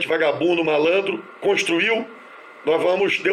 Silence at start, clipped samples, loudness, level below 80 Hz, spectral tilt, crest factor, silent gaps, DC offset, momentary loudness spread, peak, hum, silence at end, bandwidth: 0 s; under 0.1%; -20 LUFS; -70 dBFS; -4 dB/octave; 14 dB; none; under 0.1%; 7 LU; -6 dBFS; none; 0 s; 12.5 kHz